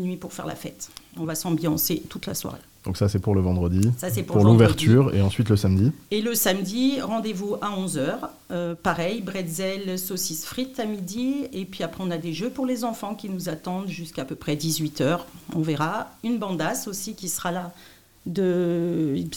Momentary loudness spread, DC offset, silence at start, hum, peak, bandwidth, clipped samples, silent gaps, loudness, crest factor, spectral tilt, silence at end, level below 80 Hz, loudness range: 12 LU; 0.2%; 0 s; none; -4 dBFS; 18 kHz; under 0.1%; none; -25 LUFS; 20 dB; -5.5 dB/octave; 0 s; -52 dBFS; 9 LU